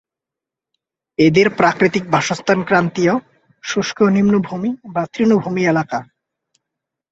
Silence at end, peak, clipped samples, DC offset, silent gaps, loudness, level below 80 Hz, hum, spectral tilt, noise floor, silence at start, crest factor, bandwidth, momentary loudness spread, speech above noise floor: 1.1 s; -2 dBFS; under 0.1%; under 0.1%; none; -16 LUFS; -56 dBFS; none; -6 dB/octave; -86 dBFS; 1.2 s; 16 dB; 8 kHz; 10 LU; 70 dB